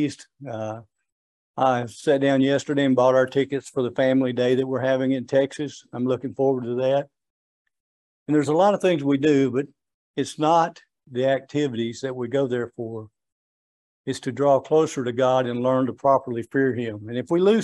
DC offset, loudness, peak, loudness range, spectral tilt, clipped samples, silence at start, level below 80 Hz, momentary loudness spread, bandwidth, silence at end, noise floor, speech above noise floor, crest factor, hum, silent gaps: under 0.1%; -23 LUFS; -6 dBFS; 5 LU; -6.5 dB/octave; under 0.1%; 0 s; -70 dBFS; 13 LU; 11.5 kHz; 0 s; under -90 dBFS; over 68 dB; 18 dB; none; 1.12-1.54 s, 7.30-7.65 s, 7.80-8.26 s, 9.94-10.14 s, 13.32-14.04 s